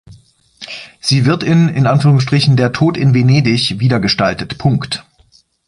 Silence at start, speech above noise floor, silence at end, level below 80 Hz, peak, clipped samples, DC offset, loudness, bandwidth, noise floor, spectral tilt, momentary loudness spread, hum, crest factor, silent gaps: 0.1 s; 39 dB; 0.65 s; -44 dBFS; 0 dBFS; under 0.1%; under 0.1%; -13 LUFS; 11.5 kHz; -51 dBFS; -6 dB/octave; 12 LU; none; 12 dB; none